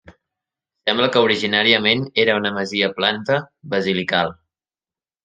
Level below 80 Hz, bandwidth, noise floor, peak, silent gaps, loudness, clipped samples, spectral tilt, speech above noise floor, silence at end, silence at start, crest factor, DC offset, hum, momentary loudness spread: -62 dBFS; 9.2 kHz; under -90 dBFS; 0 dBFS; none; -18 LUFS; under 0.1%; -5 dB/octave; over 71 dB; 0.9 s; 0.85 s; 20 dB; under 0.1%; none; 8 LU